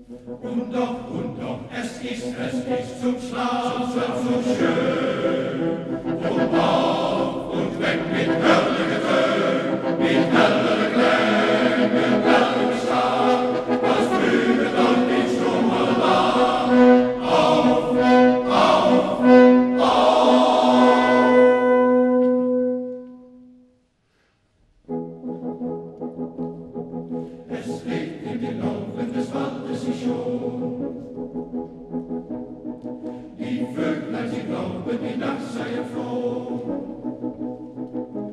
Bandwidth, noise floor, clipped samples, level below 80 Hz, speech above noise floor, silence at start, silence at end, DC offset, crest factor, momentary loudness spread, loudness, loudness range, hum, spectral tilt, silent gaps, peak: 11 kHz; -65 dBFS; under 0.1%; -54 dBFS; 40 dB; 0 s; 0 s; under 0.1%; 18 dB; 17 LU; -20 LUFS; 15 LU; none; -6 dB/octave; none; -2 dBFS